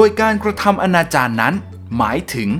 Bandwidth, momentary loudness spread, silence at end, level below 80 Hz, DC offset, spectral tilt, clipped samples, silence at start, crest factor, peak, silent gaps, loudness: 19 kHz; 6 LU; 0 s; -42 dBFS; under 0.1%; -5.5 dB/octave; under 0.1%; 0 s; 16 dB; 0 dBFS; none; -16 LUFS